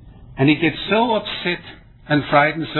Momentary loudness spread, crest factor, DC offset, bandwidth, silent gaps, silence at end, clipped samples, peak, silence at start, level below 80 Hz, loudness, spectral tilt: 8 LU; 20 dB; under 0.1%; 4.3 kHz; none; 0 s; under 0.1%; 0 dBFS; 0.05 s; -48 dBFS; -18 LUFS; -9 dB/octave